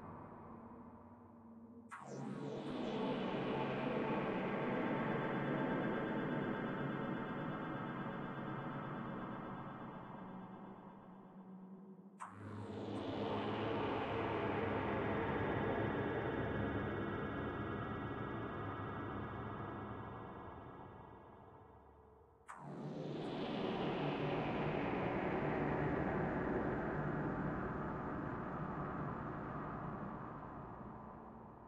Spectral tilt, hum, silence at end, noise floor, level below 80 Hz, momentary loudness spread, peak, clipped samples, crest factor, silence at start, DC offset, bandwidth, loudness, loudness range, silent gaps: -8 dB/octave; none; 0 s; -64 dBFS; -60 dBFS; 16 LU; -26 dBFS; under 0.1%; 16 dB; 0 s; under 0.1%; 9.6 kHz; -42 LUFS; 10 LU; none